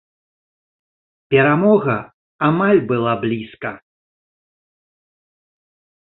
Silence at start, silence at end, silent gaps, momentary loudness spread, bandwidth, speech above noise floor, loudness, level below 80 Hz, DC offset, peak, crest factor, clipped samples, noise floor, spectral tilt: 1.3 s; 2.25 s; 2.14-2.39 s; 13 LU; 4.1 kHz; over 74 dB; -17 LUFS; -58 dBFS; under 0.1%; -2 dBFS; 18 dB; under 0.1%; under -90 dBFS; -12 dB/octave